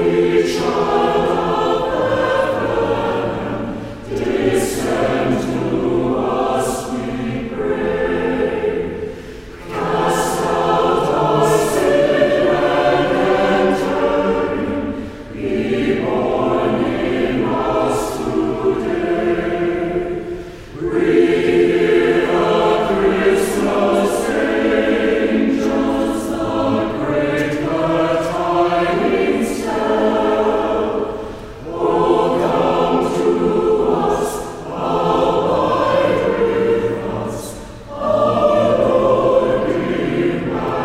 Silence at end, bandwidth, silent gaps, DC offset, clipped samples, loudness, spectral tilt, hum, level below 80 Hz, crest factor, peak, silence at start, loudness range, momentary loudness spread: 0 s; 16 kHz; none; under 0.1%; under 0.1%; -17 LUFS; -5.5 dB/octave; none; -40 dBFS; 16 dB; -2 dBFS; 0 s; 4 LU; 9 LU